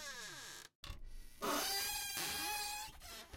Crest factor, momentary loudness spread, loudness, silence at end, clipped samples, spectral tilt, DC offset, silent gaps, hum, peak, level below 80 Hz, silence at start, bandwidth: 18 dB; 17 LU; -40 LUFS; 0 s; under 0.1%; -1 dB/octave; under 0.1%; 0.75-0.83 s; none; -24 dBFS; -58 dBFS; 0 s; 16.5 kHz